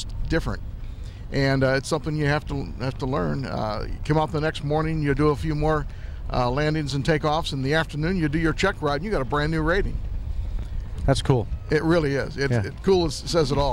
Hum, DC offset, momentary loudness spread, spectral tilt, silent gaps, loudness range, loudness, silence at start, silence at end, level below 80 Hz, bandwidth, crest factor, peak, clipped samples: none; under 0.1%; 11 LU; -6 dB/octave; none; 2 LU; -24 LUFS; 0 s; 0 s; -32 dBFS; 13 kHz; 18 dB; -6 dBFS; under 0.1%